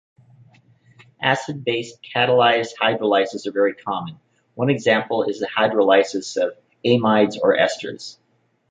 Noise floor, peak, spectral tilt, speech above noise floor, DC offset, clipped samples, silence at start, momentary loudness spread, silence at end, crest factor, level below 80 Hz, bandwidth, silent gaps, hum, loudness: -65 dBFS; -2 dBFS; -5 dB/octave; 46 dB; under 0.1%; under 0.1%; 1.2 s; 11 LU; 0.6 s; 18 dB; -66 dBFS; 9.2 kHz; none; none; -20 LUFS